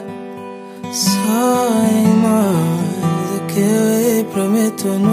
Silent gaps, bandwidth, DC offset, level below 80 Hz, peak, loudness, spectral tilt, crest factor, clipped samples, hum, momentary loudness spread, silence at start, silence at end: none; 15.5 kHz; under 0.1%; -60 dBFS; -2 dBFS; -15 LUFS; -5.5 dB/octave; 14 dB; under 0.1%; none; 17 LU; 0 s; 0 s